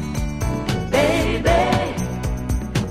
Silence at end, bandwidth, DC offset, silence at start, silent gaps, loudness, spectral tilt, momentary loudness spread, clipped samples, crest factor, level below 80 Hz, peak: 0 s; 15.5 kHz; 0.7%; 0 s; none; -21 LUFS; -5.5 dB/octave; 8 LU; under 0.1%; 16 dB; -28 dBFS; -4 dBFS